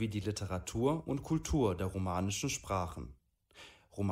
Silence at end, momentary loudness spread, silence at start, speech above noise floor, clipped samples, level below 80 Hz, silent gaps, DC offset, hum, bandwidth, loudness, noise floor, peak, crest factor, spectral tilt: 0 s; 18 LU; 0 s; 24 dB; under 0.1%; -50 dBFS; none; under 0.1%; none; 16 kHz; -36 LUFS; -59 dBFS; -18 dBFS; 18 dB; -5.5 dB/octave